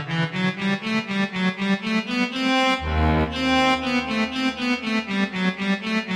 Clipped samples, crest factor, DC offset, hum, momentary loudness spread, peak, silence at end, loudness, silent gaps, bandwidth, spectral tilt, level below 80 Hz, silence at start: under 0.1%; 14 dB; under 0.1%; none; 5 LU; -8 dBFS; 0 s; -22 LUFS; none; 12 kHz; -5.5 dB/octave; -36 dBFS; 0 s